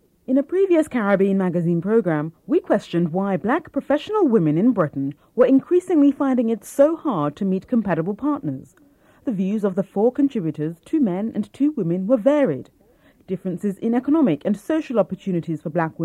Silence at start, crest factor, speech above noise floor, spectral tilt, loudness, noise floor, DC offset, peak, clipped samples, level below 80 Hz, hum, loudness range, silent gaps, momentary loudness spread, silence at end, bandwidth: 0.3 s; 16 dB; 35 dB; -8 dB/octave; -21 LUFS; -55 dBFS; under 0.1%; -4 dBFS; under 0.1%; -62 dBFS; none; 4 LU; none; 8 LU; 0 s; 13 kHz